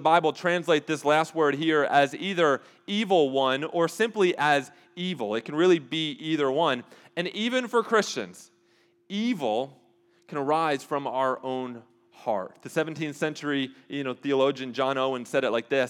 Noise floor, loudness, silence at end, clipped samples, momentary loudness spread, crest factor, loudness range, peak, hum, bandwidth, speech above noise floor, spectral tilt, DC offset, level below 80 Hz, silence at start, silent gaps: -64 dBFS; -26 LUFS; 0 s; under 0.1%; 10 LU; 20 dB; 6 LU; -6 dBFS; none; 15 kHz; 39 dB; -4.5 dB/octave; under 0.1%; under -90 dBFS; 0 s; none